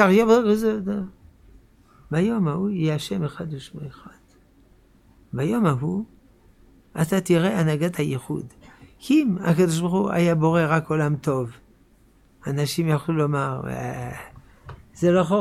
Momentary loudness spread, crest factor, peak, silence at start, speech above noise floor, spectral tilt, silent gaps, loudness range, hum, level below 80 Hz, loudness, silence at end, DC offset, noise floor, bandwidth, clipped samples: 16 LU; 20 dB; -4 dBFS; 0 s; 35 dB; -7 dB/octave; none; 7 LU; none; -54 dBFS; -23 LUFS; 0 s; under 0.1%; -56 dBFS; 15 kHz; under 0.1%